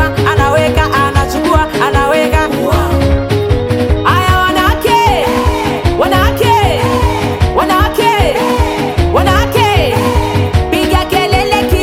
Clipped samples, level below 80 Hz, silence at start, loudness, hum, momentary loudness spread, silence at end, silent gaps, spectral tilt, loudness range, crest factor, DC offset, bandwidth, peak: under 0.1%; -20 dBFS; 0 s; -11 LUFS; none; 3 LU; 0 s; none; -5.5 dB/octave; 1 LU; 10 dB; under 0.1%; 16.5 kHz; 0 dBFS